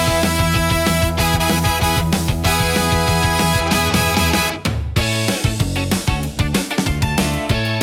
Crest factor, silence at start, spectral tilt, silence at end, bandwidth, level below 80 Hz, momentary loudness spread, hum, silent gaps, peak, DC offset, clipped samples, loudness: 14 dB; 0 s; -4 dB/octave; 0 s; 17.5 kHz; -28 dBFS; 4 LU; none; none; -2 dBFS; under 0.1%; under 0.1%; -17 LUFS